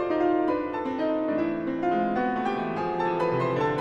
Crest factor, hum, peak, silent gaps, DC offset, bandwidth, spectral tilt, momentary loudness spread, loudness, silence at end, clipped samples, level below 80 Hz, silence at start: 12 dB; none; -14 dBFS; none; under 0.1%; 7.8 kHz; -8 dB/octave; 4 LU; -26 LUFS; 0 s; under 0.1%; -58 dBFS; 0 s